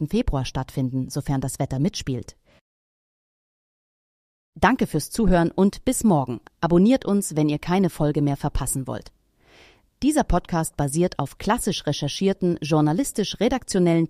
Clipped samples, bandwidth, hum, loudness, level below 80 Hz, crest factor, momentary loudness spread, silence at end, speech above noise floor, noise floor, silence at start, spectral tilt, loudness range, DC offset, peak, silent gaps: under 0.1%; 15.5 kHz; none; -23 LUFS; -36 dBFS; 18 dB; 7 LU; 0 s; 33 dB; -55 dBFS; 0 s; -5.5 dB/octave; 8 LU; under 0.1%; -4 dBFS; 2.61-4.53 s